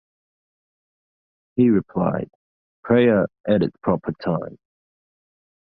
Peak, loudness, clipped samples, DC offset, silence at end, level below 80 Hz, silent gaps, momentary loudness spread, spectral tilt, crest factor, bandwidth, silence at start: -4 dBFS; -21 LUFS; under 0.1%; under 0.1%; 1.25 s; -54 dBFS; 2.35-2.83 s, 3.40-3.44 s; 12 LU; -11.5 dB/octave; 18 dB; 5.2 kHz; 1.55 s